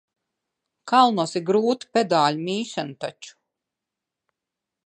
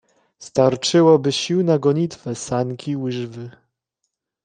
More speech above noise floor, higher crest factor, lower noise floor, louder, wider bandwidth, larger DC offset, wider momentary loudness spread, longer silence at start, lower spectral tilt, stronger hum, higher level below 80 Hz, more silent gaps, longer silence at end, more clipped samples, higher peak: first, 64 dB vs 59 dB; about the same, 22 dB vs 18 dB; first, -86 dBFS vs -77 dBFS; second, -22 LUFS vs -19 LUFS; about the same, 10.5 kHz vs 9.8 kHz; neither; about the same, 13 LU vs 15 LU; first, 0.85 s vs 0.4 s; about the same, -5 dB/octave vs -5.5 dB/octave; neither; second, -76 dBFS vs -60 dBFS; neither; first, 1.55 s vs 0.95 s; neither; about the same, -4 dBFS vs -2 dBFS